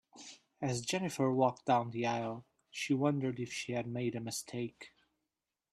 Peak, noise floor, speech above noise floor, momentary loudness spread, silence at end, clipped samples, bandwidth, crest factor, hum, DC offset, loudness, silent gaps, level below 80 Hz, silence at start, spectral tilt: -16 dBFS; -89 dBFS; 55 dB; 18 LU; 0.85 s; under 0.1%; 13.5 kHz; 20 dB; none; under 0.1%; -35 LUFS; none; -74 dBFS; 0.15 s; -5 dB/octave